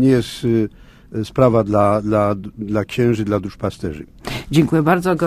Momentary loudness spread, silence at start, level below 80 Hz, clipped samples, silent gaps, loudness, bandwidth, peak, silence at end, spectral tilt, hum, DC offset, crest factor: 13 LU; 0 s; -42 dBFS; under 0.1%; none; -18 LUFS; 15.5 kHz; 0 dBFS; 0 s; -7.5 dB/octave; none; under 0.1%; 18 dB